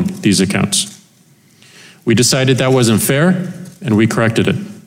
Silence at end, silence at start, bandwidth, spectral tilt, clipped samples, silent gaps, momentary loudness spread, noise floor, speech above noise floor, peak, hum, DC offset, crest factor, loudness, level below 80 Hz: 0.05 s; 0 s; 16.5 kHz; -4.5 dB/octave; under 0.1%; none; 10 LU; -49 dBFS; 36 dB; -2 dBFS; none; under 0.1%; 12 dB; -13 LUFS; -52 dBFS